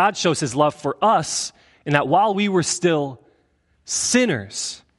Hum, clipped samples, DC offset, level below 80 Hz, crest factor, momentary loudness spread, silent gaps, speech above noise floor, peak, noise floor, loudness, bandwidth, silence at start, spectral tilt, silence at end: none; under 0.1%; under 0.1%; -60 dBFS; 20 dB; 10 LU; none; 43 dB; 0 dBFS; -63 dBFS; -20 LUFS; 11.5 kHz; 0 s; -3.5 dB/octave; 0.2 s